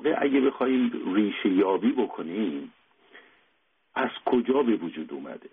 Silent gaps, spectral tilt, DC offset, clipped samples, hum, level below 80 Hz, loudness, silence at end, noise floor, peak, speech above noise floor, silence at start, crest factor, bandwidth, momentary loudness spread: none; -4 dB/octave; under 0.1%; under 0.1%; none; -70 dBFS; -26 LUFS; 0.05 s; -70 dBFS; -12 dBFS; 45 dB; 0 s; 16 dB; 3.9 kHz; 13 LU